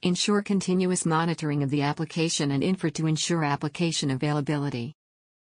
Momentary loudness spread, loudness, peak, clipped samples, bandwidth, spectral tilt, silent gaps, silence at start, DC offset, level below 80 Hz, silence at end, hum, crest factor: 4 LU; -26 LUFS; -10 dBFS; under 0.1%; 10 kHz; -5 dB/octave; none; 0.05 s; under 0.1%; -64 dBFS; 0.55 s; none; 16 dB